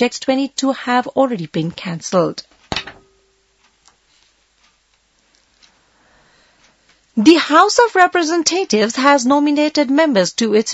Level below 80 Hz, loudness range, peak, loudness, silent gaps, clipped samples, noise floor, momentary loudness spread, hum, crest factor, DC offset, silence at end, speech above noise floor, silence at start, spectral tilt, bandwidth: -56 dBFS; 15 LU; 0 dBFS; -15 LUFS; none; under 0.1%; -60 dBFS; 13 LU; none; 16 dB; under 0.1%; 0 s; 45 dB; 0 s; -3.5 dB/octave; 8.2 kHz